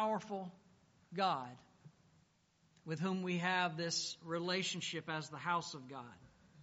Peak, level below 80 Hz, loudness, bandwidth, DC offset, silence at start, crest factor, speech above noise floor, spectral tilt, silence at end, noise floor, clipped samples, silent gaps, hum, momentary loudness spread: -22 dBFS; -82 dBFS; -39 LUFS; 8 kHz; under 0.1%; 0 s; 20 dB; 34 dB; -3 dB/octave; 0 s; -74 dBFS; under 0.1%; none; none; 16 LU